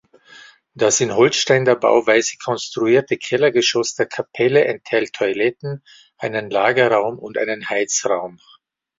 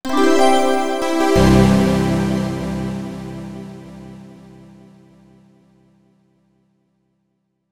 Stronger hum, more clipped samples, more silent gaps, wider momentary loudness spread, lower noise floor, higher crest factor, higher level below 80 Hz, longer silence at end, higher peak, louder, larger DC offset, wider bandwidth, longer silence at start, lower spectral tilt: neither; neither; neither; second, 9 LU vs 24 LU; second, -45 dBFS vs -70 dBFS; about the same, 16 dB vs 18 dB; second, -62 dBFS vs -34 dBFS; first, 0.7 s vs 0 s; about the same, -2 dBFS vs 0 dBFS; about the same, -18 LUFS vs -16 LUFS; neither; second, 7.8 kHz vs 20 kHz; first, 0.75 s vs 0 s; second, -3.5 dB/octave vs -6 dB/octave